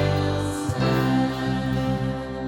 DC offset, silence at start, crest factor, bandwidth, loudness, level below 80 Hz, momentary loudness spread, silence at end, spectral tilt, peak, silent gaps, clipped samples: under 0.1%; 0 s; 12 dB; 18 kHz; -24 LUFS; -40 dBFS; 5 LU; 0 s; -6.5 dB/octave; -10 dBFS; none; under 0.1%